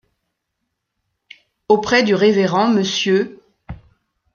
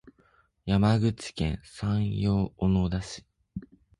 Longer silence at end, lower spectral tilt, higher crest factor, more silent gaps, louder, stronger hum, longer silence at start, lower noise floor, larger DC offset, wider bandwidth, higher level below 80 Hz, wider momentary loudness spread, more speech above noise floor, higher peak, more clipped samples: first, 0.6 s vs 0.35 s; second, -5 dB/octave vs -7 dB/octave; about the same, 18 dB vs 16 dB; neither; first, -16 LUFS vs -28 LUFS; neither; first, 1.7 s vs 0.05 s; first, -76 dBFS vs -65 dBFS; neither; second, 7.2 kHz vs 11 kHz; second, -50 dBFS vs -42 dBFS; second, 4 LU vs 19 LU; first, 61 dB vs 38 dB; first, -2 dBFS vs -12 dBFS; neither